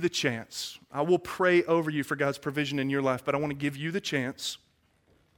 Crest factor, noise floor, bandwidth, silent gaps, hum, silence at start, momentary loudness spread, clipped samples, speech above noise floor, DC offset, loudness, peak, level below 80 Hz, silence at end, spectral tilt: 18 dB; -67 dBFS; 17.5 kHz; none; none; 0 s; 11 LU; under 0.1%; 38 dB; under 0.1%; -29 LUFS; -10 dBFS; -66 dBFS; 0.8 s; -5 dB/octave